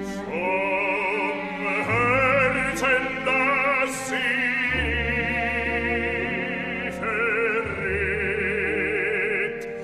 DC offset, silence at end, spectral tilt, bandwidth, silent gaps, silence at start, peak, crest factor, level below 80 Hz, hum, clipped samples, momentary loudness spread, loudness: under 0.1%; 0 s; -4.5 dB/octave; 15 kHz; none; 0 s; -8 dBFS; 16 dB; -42 dBFS; none; under 0.1%; 7 LU; -23 LUFS